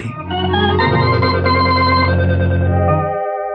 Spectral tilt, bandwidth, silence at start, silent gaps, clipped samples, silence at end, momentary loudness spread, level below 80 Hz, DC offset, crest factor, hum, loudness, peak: -8.5 dB/octave; 5.4 kHz; 0 s; none; under 0.1%; 0 s; 6 LU; -34 dBFS; under 0.1%; 10 dB; none; -15 LUFS; -4 dBFS